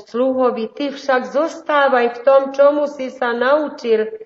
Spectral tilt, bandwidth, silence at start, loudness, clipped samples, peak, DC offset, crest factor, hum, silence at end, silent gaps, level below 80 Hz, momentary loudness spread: -1.5 dB/octave; 7.6 kHz; 0.15 s; -17 LUFS; under 0.1%; -2 dBFS; under 0.1%; 16 dB; none; 0 s; none; -72 dBFS; 9 LU